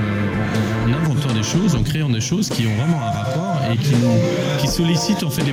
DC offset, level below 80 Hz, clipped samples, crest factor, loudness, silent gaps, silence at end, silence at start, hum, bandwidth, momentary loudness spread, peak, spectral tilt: under 0.1%; -38 dBFS; under 0.1%; 12 dB; -19 LUFS; none; 0 s; 0 s; none; 16 kHz; 4 LU; -6 dBFS; -5.5 dB/octave